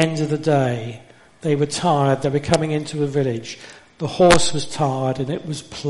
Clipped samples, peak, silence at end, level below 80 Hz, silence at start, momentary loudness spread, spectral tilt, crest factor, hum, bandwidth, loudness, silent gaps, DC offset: under 0.1%; 0 dBFS; 0 s; -44 dBFS; 0 s; 14 LU; -5 dB/octave; 20 dB; none; 11.5 kHz; -20 LUFS; none; under 0.1%